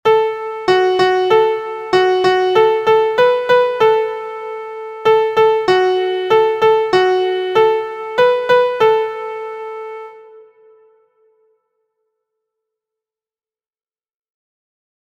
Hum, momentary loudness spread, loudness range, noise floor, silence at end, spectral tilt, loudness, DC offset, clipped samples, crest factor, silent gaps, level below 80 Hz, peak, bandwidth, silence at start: none; 14 LU; 8 LU; under -90 dBFS; 4.65 s; -5 dB/octave; -14 LUFS; under 0.1%; under 0.1%; 16 dB; none; -58 dBFS; 0 dBFS; 15 kHz; 0.05 s